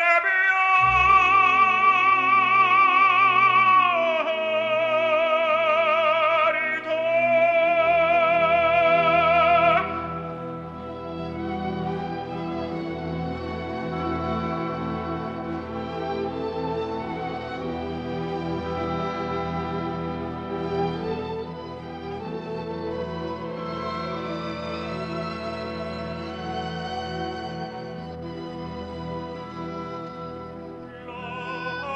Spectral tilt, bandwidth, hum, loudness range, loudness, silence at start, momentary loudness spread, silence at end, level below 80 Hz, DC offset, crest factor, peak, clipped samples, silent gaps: -6 dB/octave; 7.8 kHz; none; 15 LU; -23 LUFS; 0 s; 17 LU; 0 s; -50 dBFS; under 0.1%; 16 dB; -6 dBFS; under 0.1%; none